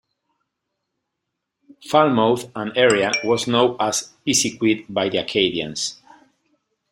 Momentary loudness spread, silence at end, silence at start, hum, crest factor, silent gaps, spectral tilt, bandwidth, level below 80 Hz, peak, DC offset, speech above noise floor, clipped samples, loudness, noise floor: 8 LU; 1 s; 1.8 s; none; 20 dB; none; -3 dB/octave; 16 kHz; -62 dBFS; -2 dBFS; under 0.1%; 60 dB; under 0.1%; -19 LUFS; -80 dBFS